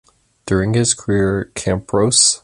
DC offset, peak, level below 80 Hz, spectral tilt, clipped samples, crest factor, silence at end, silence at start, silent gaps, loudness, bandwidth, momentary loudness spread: under 0.1%; 0 dBFS; -38 dBFS; -3.5 dB/octave; under 0.1%; 18 dB; 0.05 s; 0.45 s; none; -16 LUFS; 11.5 kHz; 10 LU